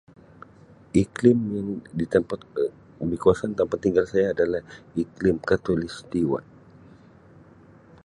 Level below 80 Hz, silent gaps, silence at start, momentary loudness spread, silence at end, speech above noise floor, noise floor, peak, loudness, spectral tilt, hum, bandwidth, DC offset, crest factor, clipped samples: -50 dBFS; none; 0.95 s; 11 LU; 1.65 s; 28 dB; -51 dBFS; -4 dBFS; -25 LUFS; -7.5 dB/octave; none; 11 kHz; under 0.1%; 22 dB; under 0.1%